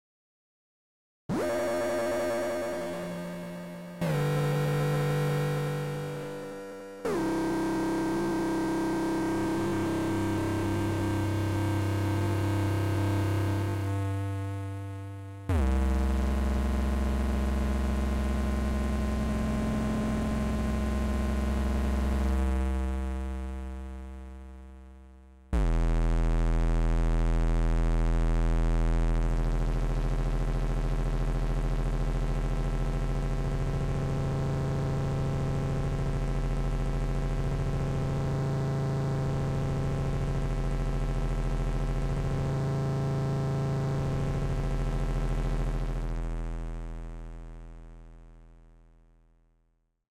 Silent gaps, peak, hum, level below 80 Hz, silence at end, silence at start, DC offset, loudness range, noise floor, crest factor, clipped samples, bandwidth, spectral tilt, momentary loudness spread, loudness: none; -20 dBFS; none; -32 dBFS; 1.65 s; 1.3 s; under 0.1%; 4 LU; -72 dBFS; 8 dB; under 0.1%; 15 kHz; -7 dB/octave; 9 LU; -31 LUFS